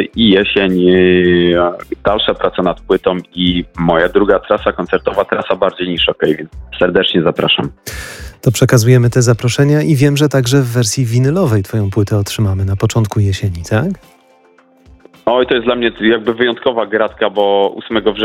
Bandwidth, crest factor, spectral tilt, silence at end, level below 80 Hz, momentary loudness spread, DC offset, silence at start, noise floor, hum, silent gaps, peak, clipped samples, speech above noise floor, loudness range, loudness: 16.5 kHz; 12 dB; -5.5 dB/octave; 0 s; -38 dBFS; 7 LU; under 0.1%; 0 s; -48 dBFS; none; none; 0 dBFS; under 0.1%; 36 dB; 5 LU; -13 LUFS